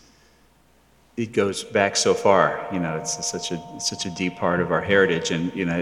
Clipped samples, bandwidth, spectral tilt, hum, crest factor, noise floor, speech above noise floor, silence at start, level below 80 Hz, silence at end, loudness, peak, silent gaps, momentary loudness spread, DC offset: under 0.1%; 13.5 kHz; -3.5 dB/octave; none; 20 dB; -58 dBFS; 36 dB; 1.15 s; -60 dBFS; 0 s; -22 LUFS; -4 dBFS; none; 9 LU; under 0.1%